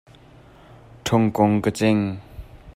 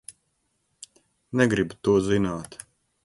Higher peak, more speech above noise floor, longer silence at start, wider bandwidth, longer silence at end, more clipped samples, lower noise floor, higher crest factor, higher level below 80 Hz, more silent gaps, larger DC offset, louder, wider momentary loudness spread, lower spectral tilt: about the same, -4 dBFS vs -6 dBFS; second, 29 dB vs 50 dB; first, 1.05 s vs 0.1 s; first, 15.5 kHz vs 11.5 kHz; second, 0.05 s vs 0.5 s; neither; second, -48 dBFS vs -73 dBFS; about the same, 20 dB vs 22 dB; about the same, -48 dBFS vs -52 dBFS; neither; neither; first, -21 LUFS vs -24 LUFS; about the same, 21 LU vs 21 LU; about the same, -6.5 dB/octave vs -6 dB/octave